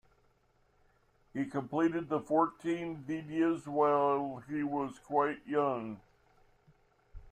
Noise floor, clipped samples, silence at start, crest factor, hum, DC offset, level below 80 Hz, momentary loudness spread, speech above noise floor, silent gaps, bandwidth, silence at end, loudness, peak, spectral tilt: -71 dBFS; under 0.1%; 1.35 s; 20 dB; none; under 0.1%; -64 dBFS; 10 LU; 38 dB; none; 9.4 kHz; 0 s; -33 LUFS; -14 dBFS; -7.5 dB/octave